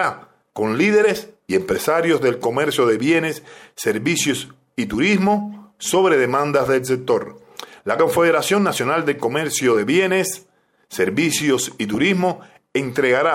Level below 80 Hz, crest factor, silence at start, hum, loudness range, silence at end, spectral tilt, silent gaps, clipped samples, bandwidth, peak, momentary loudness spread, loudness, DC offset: -56 dBFS; 14 dB; 0 s; none; 1 LU; 0 s; -4 dB/octave; none; under 0.1%; 16.5 kHz; -4 dBFS; 13 LU; -19 LUFS; under 0.1%